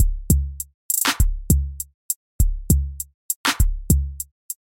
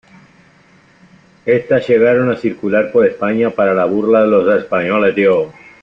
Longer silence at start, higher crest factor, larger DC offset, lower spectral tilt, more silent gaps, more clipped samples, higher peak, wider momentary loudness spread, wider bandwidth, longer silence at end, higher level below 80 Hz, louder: second, 0 s vs 1.45 s; first, 20 dB vs 14 dB; neither; second, -3.5 dB/octave vs -8 dB/octave; first, 0.74-0.89 s, 1.94-2.09 s, 2.16-2.39 s, 3.14-3.29 s, 3.36-3.44 s, 4.31-4.49 s vs none; neither; about the same, -2 dBFS vs -2 dBFS; first, 13 LU vs 6 LU; first, 17 kHz vs 5.8 kHz; about the same, 0.25 s vs 0.3 s; first, -24 dBFS vs -54 dBFS; second, -22 LUFS vs -13 LUFS